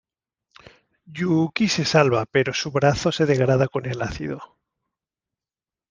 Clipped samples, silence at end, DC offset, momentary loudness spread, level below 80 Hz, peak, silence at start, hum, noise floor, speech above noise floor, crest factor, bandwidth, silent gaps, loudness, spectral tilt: under 0.1%; 1.45 s; under 0.1%; 12 LU; -50 dBFS; -2 dBFS; 1.1 s; none; under -90 dBFS; over 69 dB; 22 dB; 10 kHz; none; -21 LUFS; -5.5 dB/octave